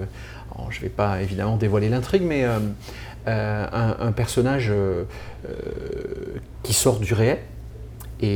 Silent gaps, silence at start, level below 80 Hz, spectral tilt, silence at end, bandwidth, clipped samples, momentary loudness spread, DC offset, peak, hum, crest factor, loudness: none; 0 s; -40 dBFS; -5.5 dB/octave; 0 s; over 20 kHz; under 0.1%; 16 LU; under 0.1%; -4 dBFS; none; 18 dB; -23 LUFS